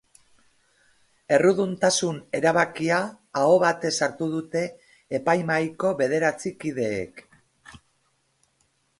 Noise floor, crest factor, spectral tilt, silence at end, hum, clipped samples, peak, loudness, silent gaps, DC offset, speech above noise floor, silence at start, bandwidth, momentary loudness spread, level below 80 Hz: -69 dBFS; 20 dB; -4.5 dB/octave; 1.25 s; none; under 0.1%; -6 dBFS; -24 LUFS; none; under 0.1%; 46 dB; 1.3 s; 11.5 kHz; 11 LU; -64 dBFS